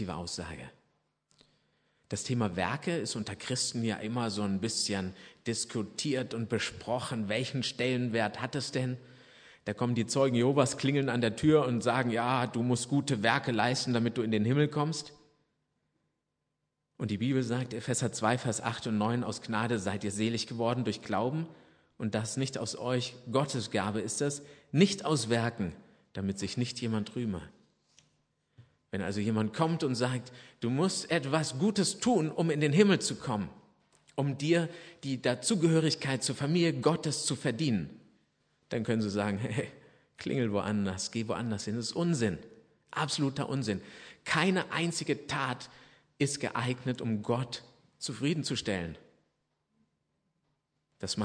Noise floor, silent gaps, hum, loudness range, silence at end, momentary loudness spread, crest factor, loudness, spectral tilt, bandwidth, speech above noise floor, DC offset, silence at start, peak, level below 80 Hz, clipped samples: -83 dBFS; none; none; 6 LU; 0 s; 11 LU; 22 dB; -31 LUFS; -5 dB/octave; 10.5 kHz; 52 dB; under 0.1%; 0 s; -10 dBFS; -66 dBFS; under 0.1%